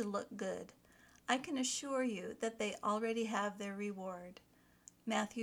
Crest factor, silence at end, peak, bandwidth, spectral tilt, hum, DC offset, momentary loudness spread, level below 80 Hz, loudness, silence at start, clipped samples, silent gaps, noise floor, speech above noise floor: 22 dB; 0 s; -18 dBFS; 19.5 kHz; -3.5 dB/octave; 60 Hz at -70 dBFS; under 0.1%; 12 LU; -78 dBFS; -40 LUFS; 0 s; under 0.1%; none; -64 dBFS; 25 dB